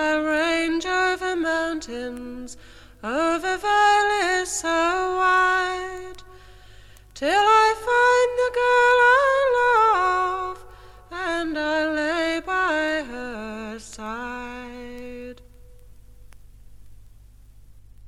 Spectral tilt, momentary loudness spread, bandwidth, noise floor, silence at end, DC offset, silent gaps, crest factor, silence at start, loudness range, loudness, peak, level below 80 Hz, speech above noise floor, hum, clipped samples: -2.5 dB/octave; 20 LU; 14.5 kHz; -48 dBFS; 0 s; under 0.1%; none; 16 dB; 0 s; 17 LU; -21 LUFS; -6 dBFS; -50 dBFS; 26 dB; none; under 0.1%